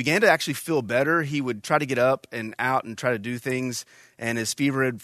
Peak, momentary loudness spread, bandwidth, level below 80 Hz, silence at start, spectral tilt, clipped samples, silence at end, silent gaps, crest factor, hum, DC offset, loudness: -4 dBFS; 8 LU; 13.5 kHz; -66 dBFS; 0 s; -4.5 dB/octave; under 0.1%; 0 s; none; 20 dB; none; under 0.1%; -24 LUFS